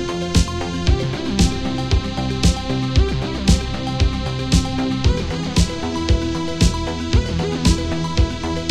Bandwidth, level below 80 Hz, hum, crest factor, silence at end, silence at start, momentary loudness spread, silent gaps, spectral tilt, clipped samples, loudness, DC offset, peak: 13 kHz; -22 dBFS; none; 16 dB; 0 s; 0 s; 4 LU; none; -5.5 dB/octave; under 0.1%; -20 LUFS; 0.6%; -2 dBFS